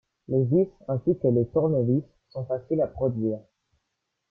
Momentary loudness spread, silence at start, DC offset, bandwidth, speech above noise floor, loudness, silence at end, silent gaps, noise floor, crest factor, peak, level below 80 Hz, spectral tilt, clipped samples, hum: 9 LU; 0.3 s; under 0.1%; 4.6 kHz; 55 dB; -26 LUFS; 0.9 s; none; -80 dBFS; 16 dB; -10 dBFS; -56 dBFS; -13 dB/octave; under 0.1%; none